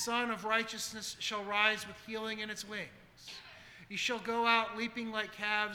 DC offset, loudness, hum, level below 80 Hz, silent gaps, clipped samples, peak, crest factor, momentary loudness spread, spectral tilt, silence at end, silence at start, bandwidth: under 0.1%; -34 LUFS; none; -72 dBFS; none; under 0.1%; -12 dBFS; 24 dB; 19 LU; -2 dB/octave; 0 s; 0 s; over 20 kHz